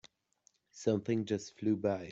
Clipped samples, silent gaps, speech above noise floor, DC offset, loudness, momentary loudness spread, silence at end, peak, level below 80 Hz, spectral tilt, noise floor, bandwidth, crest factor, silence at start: under 0.1%; none; 39 dB; under 0.1%; -35 LUFS; 5 LU; 0 s; -18 dBFS; -74 dBFS; -6.5 dB/octave; -73 dBFS; 8 kHz; 18 dB; 0.75 s